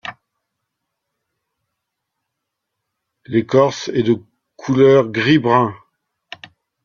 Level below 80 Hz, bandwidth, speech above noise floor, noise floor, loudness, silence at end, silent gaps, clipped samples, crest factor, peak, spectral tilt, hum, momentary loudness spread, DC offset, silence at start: -60 dBFS; 7.2 kHz; 64 dB; -78 dBFS; -16 LUFS; 1.1 s; none; under 0.1%; 18 dB; -2 dBFS; -6.5 dB/octave; none; 21 LU; under 0.1%; 0.05 s